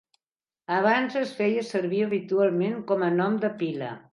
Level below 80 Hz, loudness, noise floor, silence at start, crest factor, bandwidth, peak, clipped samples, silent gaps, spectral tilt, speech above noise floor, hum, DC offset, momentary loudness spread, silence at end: -78 dBFS; -26 LUFS; under -90 dBFS; 0.7 s; 16 dB; 11.5 kHz; -8 dBFS; under 0.1%; none; -7 dB/octave; over 65 dB; none; under 0.1%; 7 LU; 0.15 s